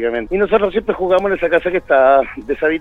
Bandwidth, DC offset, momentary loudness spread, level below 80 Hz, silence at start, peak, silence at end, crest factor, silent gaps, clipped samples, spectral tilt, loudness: 6.4 kHz; under 0.1%; 7 LU; -40 dBFS; 0 s; 0 dBFS; 0 s; 14 dB; none; under 0.1%; -7 dB/octave; -15 LUFS